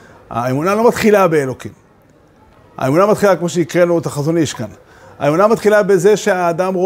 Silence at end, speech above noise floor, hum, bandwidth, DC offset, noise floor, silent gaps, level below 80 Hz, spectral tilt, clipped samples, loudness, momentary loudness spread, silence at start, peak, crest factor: 0 s; 35 dB; none; 16 kHz; under 0.1%; -48 dBFS; none; -52 dBFS; -6 dB/octave; under 0.1%; -14 LUFS; 12 LU; 0.3 s; 0 dBFS; 14 dB